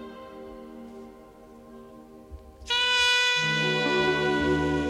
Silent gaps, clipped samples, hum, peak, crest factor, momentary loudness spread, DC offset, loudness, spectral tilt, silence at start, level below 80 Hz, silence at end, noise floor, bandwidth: none; under 0.1%; none; -12 dBFS; 16 dB; 23 LU; under 0.1%; -23 LUFS; -3.5 dB/octave; 0 s; -48 dBFS; 0 s; -49 dBFS; 15 kHz